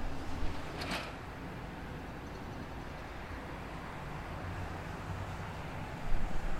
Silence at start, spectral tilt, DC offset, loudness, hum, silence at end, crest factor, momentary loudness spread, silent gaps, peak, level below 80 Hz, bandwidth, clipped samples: 0 s; -5.5 dB/octave; under 0.1%; -42 LUFS; none; 0 s; 20 dB; 5 LU; none; -18 dBFS; -42 dBFS; 13.5 kHz; under 0.1%